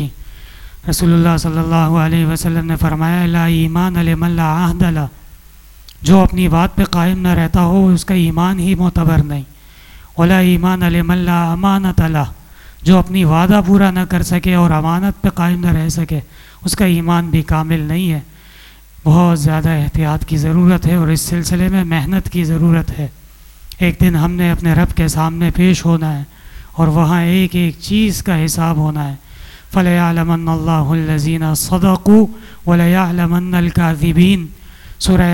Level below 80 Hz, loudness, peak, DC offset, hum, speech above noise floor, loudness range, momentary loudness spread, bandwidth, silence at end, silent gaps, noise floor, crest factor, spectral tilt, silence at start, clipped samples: -28 dBFS; -14 LUFS; 0 dBFS; under 0.1%; none; 27 dB; 3 LU; 8 LU; 16 kHz; 0 s; none; -39 dBFS; 12 dB; -6.5 dB/octave; 0 s; under 0.1%